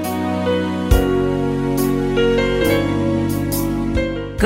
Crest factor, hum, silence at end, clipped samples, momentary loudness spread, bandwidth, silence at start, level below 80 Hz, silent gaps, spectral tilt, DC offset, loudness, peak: 16 dB; none; 0 s; under 0.1%; 4 LU; 16.5 kHz; 0 s; -26 dBFS; none; -6 dB/octave; under 0.1%; -18 LUFS; -2 dBFS